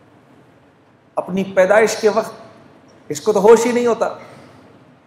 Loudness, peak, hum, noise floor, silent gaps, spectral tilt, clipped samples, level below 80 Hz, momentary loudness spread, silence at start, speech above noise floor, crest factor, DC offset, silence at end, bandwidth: -16 LUFS; 0 dBFS; none; -51 dBFS; none; -4.5 dB/octave; under 0.1%; -62 dBFS; 17 LU; 1.15 s; 37 dB; 18 dB; under 0.1%; 0.8 s; 15 kHz